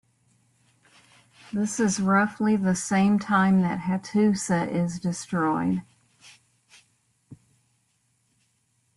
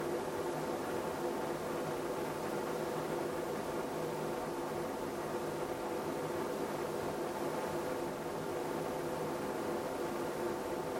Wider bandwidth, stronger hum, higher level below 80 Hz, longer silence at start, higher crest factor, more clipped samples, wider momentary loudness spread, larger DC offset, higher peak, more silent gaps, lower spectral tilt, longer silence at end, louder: second, 12 kHz vs 16.5 kHz; neither; about the same, -64 dBFS vs -66 dBFS; first, 1.55 s vs 0 s; about the same, 18 dB vs 14 dB; neither; first, 7 LU vs 1 LU; neither; first, -8 dBFS vs -24 dBFS; neither; about the same, -6 dB/octave vs -5 dB/octave; first, 1.65 s vs 0 s; first, -24 LUFS vs -38 LUFS